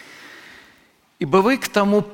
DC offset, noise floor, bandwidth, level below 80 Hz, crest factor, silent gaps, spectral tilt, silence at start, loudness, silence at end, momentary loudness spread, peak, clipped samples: under 0.1%; -56 dBFS; 17 kHz; -56 dBFS; 18 dB; none; -5.5 dB/octave; 0.2 s; -18 LUFS; 0 s; 23 LU; -2 dBFS; under 0.1%